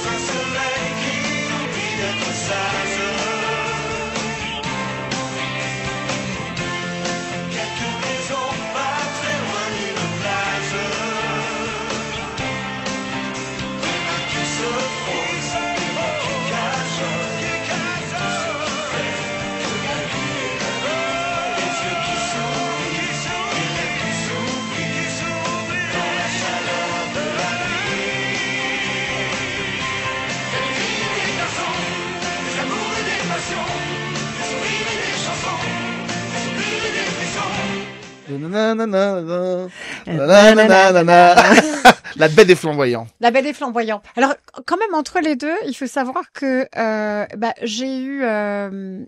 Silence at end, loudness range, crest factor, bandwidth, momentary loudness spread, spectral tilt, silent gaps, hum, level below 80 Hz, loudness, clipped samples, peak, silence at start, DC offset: 0 s; 11 LU; 20 dB; 15.5 kHz; 9 LU; -3.5 dB/octave; none; none; -50 dBFS; -19 LUFS; under 0.1%; 0 dBFS; 0 s; under 0.1%